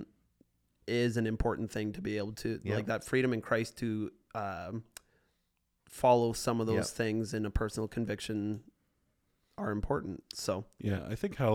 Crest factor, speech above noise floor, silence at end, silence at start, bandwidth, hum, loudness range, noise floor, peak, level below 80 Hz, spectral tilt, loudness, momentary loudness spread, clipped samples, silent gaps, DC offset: 20 dB; 46 dB; 0 s; 0 s; 17 kHz; none; 5 LU; -79 dBFS; -14 dBFS; -50 dBFS; -6 dB/octave; -34 LUFS; 11 LU; under 0.1%; none; under 0.1%